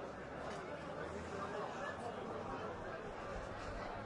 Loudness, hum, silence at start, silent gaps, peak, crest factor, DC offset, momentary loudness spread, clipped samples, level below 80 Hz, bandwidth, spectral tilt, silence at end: -46 LUFS; none; 0 s; none; -30 dBFS; 16 dB; under 0.1%; 3 LU; under 0.1%; -60 dBFS; 11 kHz; -5.5 dB/octave; 0 s